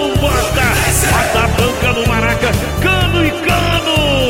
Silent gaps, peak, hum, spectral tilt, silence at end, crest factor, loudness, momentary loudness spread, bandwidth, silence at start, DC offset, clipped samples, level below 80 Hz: none; -2 dBFS; none; -4 dB/octave; 0 s; 10 dB; -13 LUFS; 2 LU; 17 kHz; 0 s; under 0.1%; under 0.1%; -22 dBFS